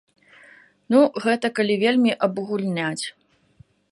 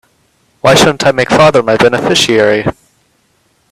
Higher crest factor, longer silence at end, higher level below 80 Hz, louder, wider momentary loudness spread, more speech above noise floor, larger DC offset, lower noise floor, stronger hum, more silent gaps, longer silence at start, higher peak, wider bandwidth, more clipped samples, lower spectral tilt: first, 18 dB vs 10 dB; second, 0.8 s vs 1 s; second, -72 dBFS vs -42 dBFS; second, -21 LUFS vs -9 LUFS; about the same, 8 LU vs 6 LU; second, 35 dB vs 47 dB; neither; about the same, -55 dBFS vs -55 dBFS; neither; neither; first, 0.9 s vs 0.65 s; second, -6 dBFS vs 0 dBFS; second, 11.5 kHz vs 14.5 kHz; second, under 0.1% vs 0.1%; about the same, -5 dB/octave vs -4 dB/octave